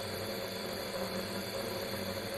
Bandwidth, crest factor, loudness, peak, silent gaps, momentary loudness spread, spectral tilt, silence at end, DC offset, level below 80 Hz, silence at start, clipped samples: 16 kHz; 14 dB; -38 LUFS; -24 dBFS; none; 1 LU; -4 dB/octave; 0 s; under 0.1%; -62 dBFS; 0 s; under 0.1%